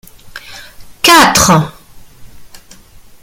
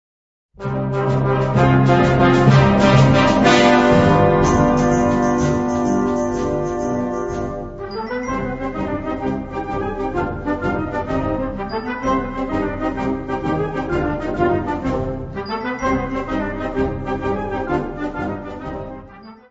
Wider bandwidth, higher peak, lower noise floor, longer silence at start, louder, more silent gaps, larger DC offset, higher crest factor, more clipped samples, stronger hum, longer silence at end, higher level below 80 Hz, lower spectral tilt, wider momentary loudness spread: first, over 20 kHz vs 8 kHz; about the same, 0 dBFS vs 0 dBFS; about the same, -38 dBFS vs -40 dBFS; second, 0.25 s vs 0.6 s; first, -7 LUFS vs -18 LUFS; neither; neither; about the same, 14 dB vs 18 dB; first, 0.3% vs under 0.1%; neither; first, 0.65 s vs 0.15 s; about the same, -36 dBFS vs -34 dBFS; second, -3 dB/octave vs -7 dB/octave; first, 26 LU vs 13 LU